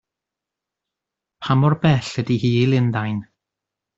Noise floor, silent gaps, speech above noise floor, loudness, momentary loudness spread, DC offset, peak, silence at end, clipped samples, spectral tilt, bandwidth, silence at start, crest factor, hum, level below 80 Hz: -85 dBFS; none; 67 dB; -19 LUFS; 10 LU; under 0.1%; -4 dBFS; 0.75 s; under 0.1%; -7.5 dB/octave; 7.8 kHz; 1.4 s; 18 dB; none; -54 dBFS